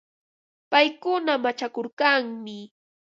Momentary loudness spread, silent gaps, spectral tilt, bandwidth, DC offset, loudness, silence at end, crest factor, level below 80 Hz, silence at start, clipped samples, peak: 16 LU; 1.93-1.97 s; -3.5 dB/octave; 7.6 kHz; under 0.1%; -23 LUFS; 0.4 s; 22 dB; -82 dBFS; 0.7 s; under 0.1%; -4 dBFS